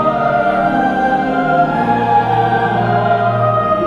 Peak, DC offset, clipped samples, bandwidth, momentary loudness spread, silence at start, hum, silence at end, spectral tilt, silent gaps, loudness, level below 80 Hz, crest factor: -2 dBFS; 0.4%; under 0.1%; 10 kHz; 2 LU; 0 s; none; 0 s; -8 dB/octave; none; -14 LUFS; -44 dBFS; 10 dB